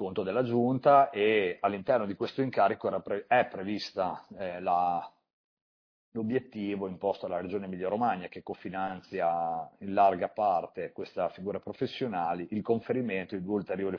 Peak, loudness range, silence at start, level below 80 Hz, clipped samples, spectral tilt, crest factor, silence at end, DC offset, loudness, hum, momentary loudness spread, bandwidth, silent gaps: -10 dBFS; 7 LU; 0 s; -72 dBFS; under 0.1%; -7.5 dB/octave; 20 dB; 0 s; under 0.1%; -30 LUFS; none; 11 LU; 5.4 kHz; 5.33-6.12 s